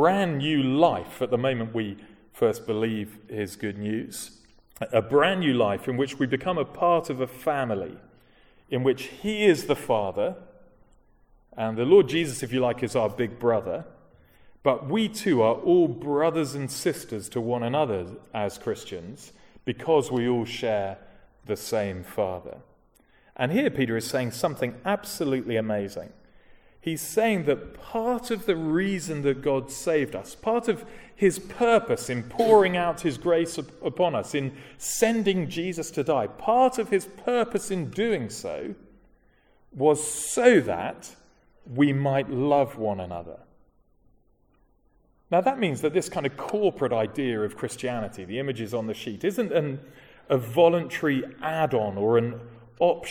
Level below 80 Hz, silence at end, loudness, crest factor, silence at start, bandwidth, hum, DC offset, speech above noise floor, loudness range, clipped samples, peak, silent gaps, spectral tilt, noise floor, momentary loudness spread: -58 dBFS; 0 s; -26 LUFS; 22 dB; 0 s; 18 kHz; none; under 0.1%; 38 dB; 5 LU; under 0.1%; -4 dBFS; none; -5.5 dB/octave; -63 dBFS; 12 LU